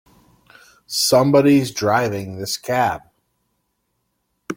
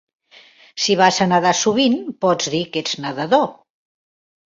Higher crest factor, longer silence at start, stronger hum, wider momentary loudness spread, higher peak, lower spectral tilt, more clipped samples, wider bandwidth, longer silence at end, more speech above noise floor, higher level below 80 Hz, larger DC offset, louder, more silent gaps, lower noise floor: about the same, 18 dB vs 18 dB; first, 0.9 s vs 0.75 s; first, 60 Hz at -50 dBFS vs none; first, 12 LU vs 9 LU; about the same, -2 dBFS vs -2 dBFS; about the same, -4.5 dB/octave vs -3.5 dB/octave; neither; first, 16.5 kHz vs 7.8 kHz; second, 0 s vs 1 s; first, 54 dB vs 31 dB; about the same, -58 dBFS vs -62 dBFS; neither; about the same, -18 LUFS vs -18 LUFS; neither; first, -71 dBFS vs -48 dBFS